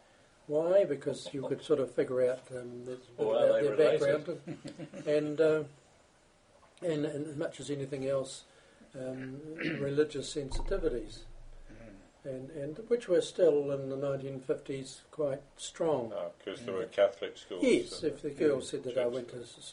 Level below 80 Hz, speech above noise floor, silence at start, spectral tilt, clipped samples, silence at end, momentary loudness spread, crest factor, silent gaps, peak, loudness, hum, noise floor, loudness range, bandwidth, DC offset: -52 dBFS; 32 dB; 0.5 s; -5.5 dB/octave; under 0.1%; 0 s; 16 LU; 18 dB; none; -14 dBFS; -33 LUFS; none; -64 dBFS; 7 LU; 10.5 kHz; under 0.1%